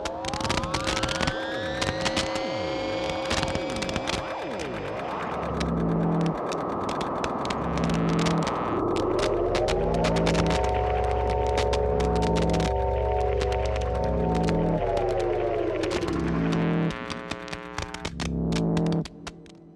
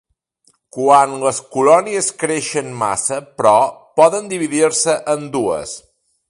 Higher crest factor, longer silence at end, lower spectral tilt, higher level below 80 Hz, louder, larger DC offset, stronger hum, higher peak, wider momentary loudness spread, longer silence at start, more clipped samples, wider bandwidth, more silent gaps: about the same, 18 dB vs 16 dB; second, 0 s vs 0.5 s; first, -5.5 dB/octave vs -3.5 dB/octave; first, -36 dBFS vs -58 dBFS; second, -27 LUFS vs -16 LUFS; neither; neither; second, -8 dBFS vs 0 dBFS; about the same, 7 LU vs 9 LU; second, 0 s vs 0.75 s; neither; about the same, 12 kHz vs 11.5 kHz; neither